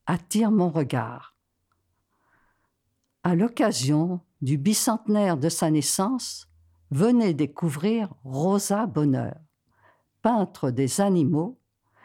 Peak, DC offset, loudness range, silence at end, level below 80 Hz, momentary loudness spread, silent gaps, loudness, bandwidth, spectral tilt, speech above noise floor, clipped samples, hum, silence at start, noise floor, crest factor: -10 dBFS; under 0.1%; 5 LU; 0.5 s; -66 dBFS; 9 LU; none; -24 LUFS; 17 kHz; -5.5 dB/octave; 52 dB; under 0.1%; none; 0.05 s; -75 dBFS; 16 dB